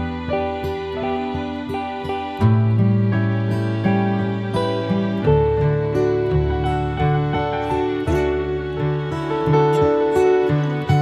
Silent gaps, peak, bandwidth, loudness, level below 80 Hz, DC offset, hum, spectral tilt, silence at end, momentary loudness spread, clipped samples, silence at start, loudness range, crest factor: none; -4 dBFS; 10.5 kHz; -20 LUFS; -34 dBFS; under 0.1%; none; -8.5 dB/octave; 0 s; 8 LU; under 0.1%; 0 s; 2 LU; 14 dB